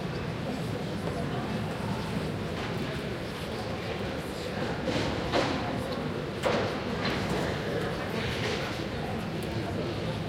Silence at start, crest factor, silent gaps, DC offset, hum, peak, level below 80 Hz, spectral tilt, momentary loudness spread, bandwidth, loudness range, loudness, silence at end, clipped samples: 0 s; 18 dB; none; under 0.1%; none; -14 dBFS; -48 dBFS; -5.5 dB/octave; 5 LU; 16.5 kHz; 3 LU; -32 LUFS; 0 s; under 0.1%